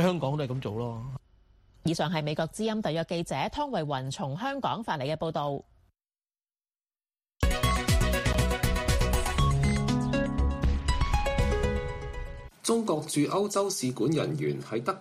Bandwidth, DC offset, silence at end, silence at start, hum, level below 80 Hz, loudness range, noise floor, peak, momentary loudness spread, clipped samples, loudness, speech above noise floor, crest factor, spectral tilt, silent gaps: 15.5 kHz; under 0.1%; 0 s; 0 s; none; -34 dBFS; 6 LU; under -90 dBFS; -12 dBFS; 8 LU; under 0.1%; -29 LUFS; over 60 dB; 16 dB; -5.5 dB/octave; none